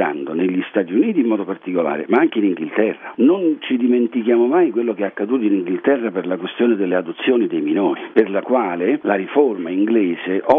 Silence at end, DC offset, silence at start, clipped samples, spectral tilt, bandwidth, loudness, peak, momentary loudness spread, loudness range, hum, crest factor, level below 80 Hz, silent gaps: 0 s; under 0.1%; 0 s; under 0.1%; -9 dB/octave; 3.8 kHz; -18 LUFS; 0 dBFS; 5 LU; 2 LU; none; 18 dB; -68 dBFS; none